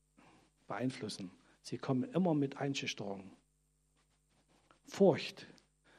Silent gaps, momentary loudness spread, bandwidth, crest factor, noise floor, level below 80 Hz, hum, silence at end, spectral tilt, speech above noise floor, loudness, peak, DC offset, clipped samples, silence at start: none; 20 LU; 13 kHz; 24 dB; -76 dBFS; -78 dBFS; none; 0.5 s; -6 dB/octave; 41 dB; -36 LUFS; -14 dBFS; under 0.1%; under 0.1%; 0.7 s